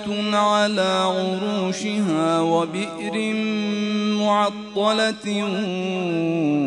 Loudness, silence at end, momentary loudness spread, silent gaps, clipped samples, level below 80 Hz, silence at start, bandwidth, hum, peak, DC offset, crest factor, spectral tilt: -22 LUFS; 0 s; 6 LU; none; under 0.1%; -64 dBFS; 0 s; 10.5 kHz; none; -6 dBFS; under 0.1%; 14 dB; -5 dB/octave